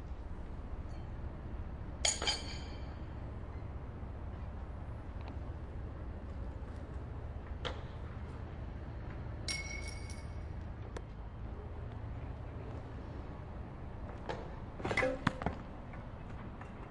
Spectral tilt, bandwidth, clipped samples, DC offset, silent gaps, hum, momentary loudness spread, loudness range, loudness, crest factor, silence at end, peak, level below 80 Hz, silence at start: -4 dB/octave; 11.5 kHz; under 0.1%; under 0.1%; none; none; 12 LU; 6 LU; -42 LUFS; 28 dB; 0 s; -14 dBFS; -46 dBFS; 0 s